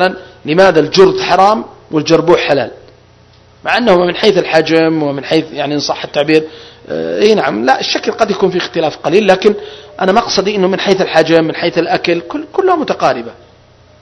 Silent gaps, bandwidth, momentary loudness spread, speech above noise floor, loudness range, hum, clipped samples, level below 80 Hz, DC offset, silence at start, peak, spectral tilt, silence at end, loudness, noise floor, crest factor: none; 11 kHz; 9 LU; 32 dB; 2 LU; none; 1%; -48 dBFS; under 0.1%; 0 s; 0 dBFS; -5 dB/octave; 0.7 s; -12 LUFS; -44 dBFS; 12 dB